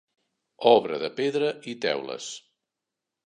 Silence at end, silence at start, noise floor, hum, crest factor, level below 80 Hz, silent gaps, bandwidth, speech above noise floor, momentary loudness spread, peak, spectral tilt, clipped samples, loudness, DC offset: 0.9 s; 0.6 s; -86 dBFS; none; 22 dB; -78 dBFS; none; 9.8 kHz; 62 dB; 16 LU; -4 dBFS; -4 dB/octave; under 0.1%; -25 LUFS; under 0.1%